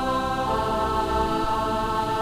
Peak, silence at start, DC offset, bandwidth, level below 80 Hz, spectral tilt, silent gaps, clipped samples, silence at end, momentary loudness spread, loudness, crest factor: -12 dBFS; 0 s; under 0.1%; 16 kHz; -36 dBFS; -5.5 dB/octave; none; under 0.1%; 0 s; 1 LU; -24 LUFS; 12 dB